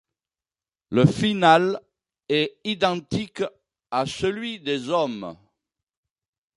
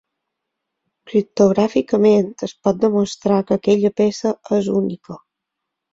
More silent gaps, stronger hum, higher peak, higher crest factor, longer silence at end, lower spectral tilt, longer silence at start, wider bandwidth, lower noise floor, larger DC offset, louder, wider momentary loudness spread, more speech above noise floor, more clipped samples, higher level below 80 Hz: neither; neither; about the same, -2 dBFS vs -2 dBFS; about the same, 22 dB vs 18 dB; first, 1.25 s vs 0.75 s; about the same, -6 dB/octave vs -7 dB/octave; second, 0.9 s vs 1.05 s; first, 11.5 kHz vs 7.8 kHz; first, under -90 dBFS vs -80 dBFS; neither; second, -23 LUFS vs -18 LUFS; first, 13 LU vs 10 LU; first, over 68 dB vs 63 dB; neither; about the same, -56 dBFS vs -58 dBFS